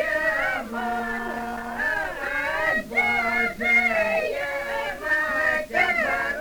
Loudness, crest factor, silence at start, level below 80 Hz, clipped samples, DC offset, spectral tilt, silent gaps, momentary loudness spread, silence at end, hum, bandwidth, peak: -23 LUFS; 16 dB; 0 s; -48 dBFS; under 0.1%; under 0.1%; -3.5 dB/octave; none; 9 LU; 0 s; none; over 20 kHz; -8 dBFS